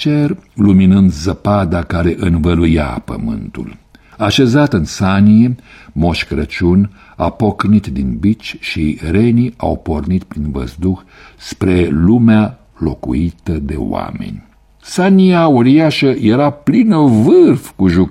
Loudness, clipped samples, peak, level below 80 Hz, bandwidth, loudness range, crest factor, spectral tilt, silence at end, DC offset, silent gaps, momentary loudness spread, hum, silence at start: -13 LUFS; under 0.1%; 0 dBFS; -30 dBFS; 12.5 kHz; 5 LU; 12 dB; -7.5 dB/octave; 0 s; under 0.1%; none; 13 LU; none; 0 s